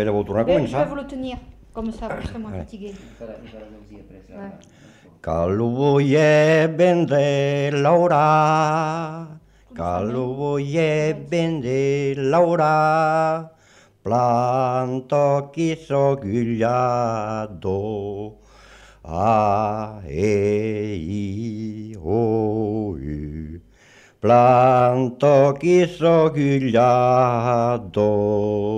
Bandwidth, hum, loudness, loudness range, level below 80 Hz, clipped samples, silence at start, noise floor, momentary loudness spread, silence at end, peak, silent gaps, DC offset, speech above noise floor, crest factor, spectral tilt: 11 kHz; none; -19 LUFS; 9 LU; -46 dBFS; under 0.1%; 0 s; -53 dBFS; 16 LU; 0 s; -4 dBFS; none; under 0.1%; 34 dB; 16 dB; -7 dB/octave